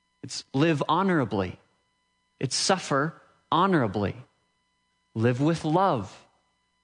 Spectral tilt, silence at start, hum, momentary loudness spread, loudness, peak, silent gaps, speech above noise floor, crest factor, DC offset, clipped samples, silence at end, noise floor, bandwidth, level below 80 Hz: -5 dB/octave; 0.25 s; none; 12 LU; -26 LUFS; -8 dBFS; none; 48 dB; 20 dB; under 0.1%; under 0.1%; 0.65 s; -73 dBFS; 11 kHz; -68 dBFS